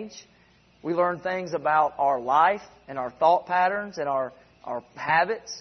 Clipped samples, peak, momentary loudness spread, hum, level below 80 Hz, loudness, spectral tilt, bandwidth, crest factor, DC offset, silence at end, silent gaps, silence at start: under 0.1%; -6 dBFS; 14 LU; none; -66 dBFS; -25 LUFS; -4.5 dB/octave; 6.4 kHz; 18 dB; under 0.1%; 0 s; none; 0 s